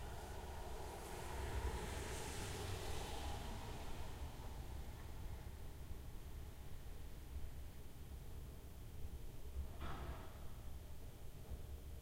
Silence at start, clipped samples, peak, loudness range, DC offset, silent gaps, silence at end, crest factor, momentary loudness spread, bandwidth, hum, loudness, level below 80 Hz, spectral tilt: 0 s; under 0.1%; -32 dBFS; 7 LU; under 0.1%; none; 0 s; 16 dB; 9 LU; 16 kHz; none; -51 LUFS; -52 dBFS; -4.5 dB/octave